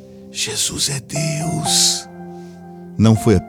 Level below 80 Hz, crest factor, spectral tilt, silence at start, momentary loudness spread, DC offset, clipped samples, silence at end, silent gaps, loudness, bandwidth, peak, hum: -44 dBFS; 16 dB; -4 dB/octave; 0 s; 22 LU; under 0.1%; under 0.1%; 0 s; none; -17 LUFS; 18.5 kHz; -2 dBFS; none